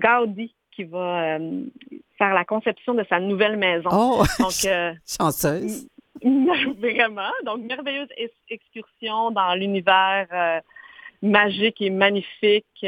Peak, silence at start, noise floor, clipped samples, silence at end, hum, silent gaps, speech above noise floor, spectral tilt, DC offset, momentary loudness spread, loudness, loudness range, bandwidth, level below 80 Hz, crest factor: -2 dBFS; 0 s; -45 dBFS; under 0.1%; 0 s; none; none; 23 dB; -4 dB/octave; under 0.1%; 14 LU; -21 LUFS; 3 LU; 18.5 kHz; -48 dBFS; 20 dB